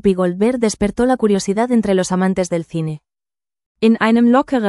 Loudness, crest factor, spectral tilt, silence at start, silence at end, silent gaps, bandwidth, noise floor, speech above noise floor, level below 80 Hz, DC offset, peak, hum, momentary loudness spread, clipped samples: -16 LUFS; 16 dB; -6 dB/octave; 0.05 s; 0 s; 3.66-3.75 s; 12 kHz; under -90 dBFS; over 75 dB; -44 dBFS; under 0.1%; 0 dBFS; none; 9 LU; under 0.1%